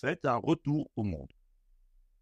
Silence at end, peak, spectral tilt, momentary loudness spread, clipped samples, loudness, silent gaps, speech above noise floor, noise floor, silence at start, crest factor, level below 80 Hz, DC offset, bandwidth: 0.95 s; -16 dBFS; -8 dB/octave; 7 LU; under 0.1%; -32 LUFS; none; 33 dB; -65 dBFS; 0.05 s; 18 dB; -56 dBFS; under 0.1%; 8.2 kHz